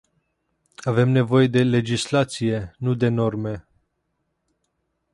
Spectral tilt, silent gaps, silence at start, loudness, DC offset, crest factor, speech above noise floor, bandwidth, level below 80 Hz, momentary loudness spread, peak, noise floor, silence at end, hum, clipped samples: -6.5 dB/octave; none; 0.85 s; -21 LUFS; under 0.1%; 18 dB; 54 dB; 11.5 kHz; -54 dBFS; 12 LU; -6 dBFS; -74 dBFS; 1.55 s; none; under 0.1%